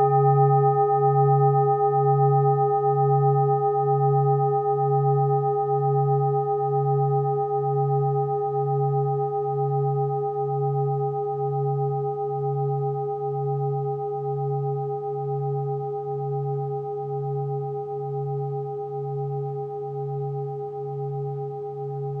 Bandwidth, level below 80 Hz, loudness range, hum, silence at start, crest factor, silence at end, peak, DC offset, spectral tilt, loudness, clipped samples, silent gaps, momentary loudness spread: 1.9 kHz; -78 dBFS; 9 LU; none; 0 s; 14 dB; 0 s; -8 dBFS; under 0.1%; -13 dB/octave; -24 LUFS; under 0.1%; none; 11 LU